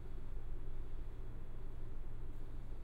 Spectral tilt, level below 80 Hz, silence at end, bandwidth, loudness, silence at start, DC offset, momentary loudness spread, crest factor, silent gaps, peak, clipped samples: -8 dB/octave; -42 dBFS; 0 s; 3.6 kHz; -52 LUFS; 0 s; under 0.1%; 2 LU; 8 dB; none; -32 dBFS; under 0.1%